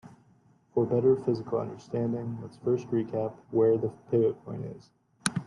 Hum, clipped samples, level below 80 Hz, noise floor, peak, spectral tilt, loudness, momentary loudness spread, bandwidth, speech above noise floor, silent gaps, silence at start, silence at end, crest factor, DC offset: none; under 0.1%; -68 dBFS; -63 dBFS; -4 dBFS; -6.5 dB/octave; -29 LUFS; 13 LU; 11.5 kHz; 34 dB; none; 0.05 s; 0 s; 24 dB; under 0.1%